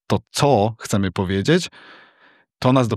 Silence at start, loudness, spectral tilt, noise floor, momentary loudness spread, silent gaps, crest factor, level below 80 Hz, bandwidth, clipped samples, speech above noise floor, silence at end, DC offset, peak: 0.1 s; -20 LUFS; -5.5 dB/octave; -56 dBFS; 6 LU; none; 18 dB; -56 dBFS; 14 kHz; under 0.1%; 37 dB; 0 s; under 0.1%; -2 dBFS